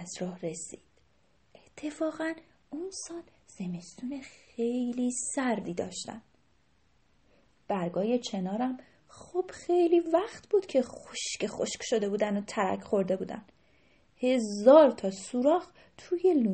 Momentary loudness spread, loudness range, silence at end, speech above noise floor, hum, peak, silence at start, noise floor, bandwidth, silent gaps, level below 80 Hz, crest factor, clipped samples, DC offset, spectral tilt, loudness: 16 LU; 12 LU; 0 s; 40 dB; none; -8 dBFS; 0 s; -69 dBFS; 8.8 kHz; none; -70 dBFS; 22 dB; under 0.1%; under 0.1%; -5 dB/octave; -29 LUFS